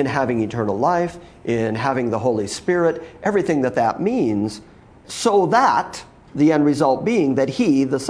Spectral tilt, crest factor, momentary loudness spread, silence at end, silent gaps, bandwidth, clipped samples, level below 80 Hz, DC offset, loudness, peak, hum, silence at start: -6 dB/octave; 16 dB; 10 LU; 0 s; none; 11 kHz; under 0.1%; -52 dBFS; under 0.1%; -19 LUFS; -4 dBFS; none; 0 s